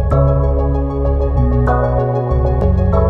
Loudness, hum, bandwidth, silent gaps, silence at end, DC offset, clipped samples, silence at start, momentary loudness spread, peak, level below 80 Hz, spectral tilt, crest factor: -15 LUFS; none; 3.6 kHz; none; 0 s; under 0.1%; under 0.1%; 0 s; 3 LU; -2 dBFS; -16 dBFS; -11 dB/octave; 12 dB